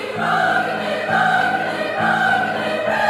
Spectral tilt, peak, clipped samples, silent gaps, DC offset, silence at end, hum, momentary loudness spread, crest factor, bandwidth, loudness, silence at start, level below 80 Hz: -4.5 dB/octave; -2 dBFS; under 0.1%; none; under 0.1%; 0 s; none; 5 LU; 16 dB; 15.5 kHz; -18 LUFS; 0 s; -60 dBFS